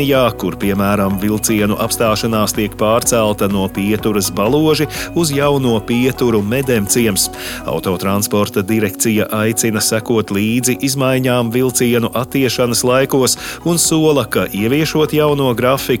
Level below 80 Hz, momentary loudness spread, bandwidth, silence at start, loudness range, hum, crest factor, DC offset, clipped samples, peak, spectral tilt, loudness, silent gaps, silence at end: -40 dBFS; 4 LU; 17.5 kHz; 0 s; 2 LU; none; 14 dB; under 0.1%; under 0.1%; -2 dBFS; -4.5 dB/octave; -15 LUFS; none; 0 s